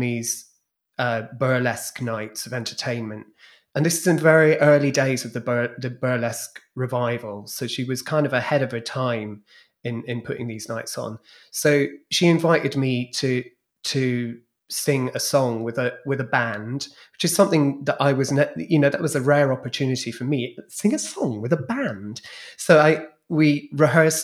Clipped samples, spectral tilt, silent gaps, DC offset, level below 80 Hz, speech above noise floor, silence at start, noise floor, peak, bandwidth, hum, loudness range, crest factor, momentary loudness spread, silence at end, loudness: under 0.1%; -5 dB/octave; none; under 0.1%; -72 dBFS; 45 dB; 0 s; -67 dBFS; -2 dBFS; 15.5 kHz; none; 6 LU; 20 dB; 14 LU; 0 s; -22 LUFS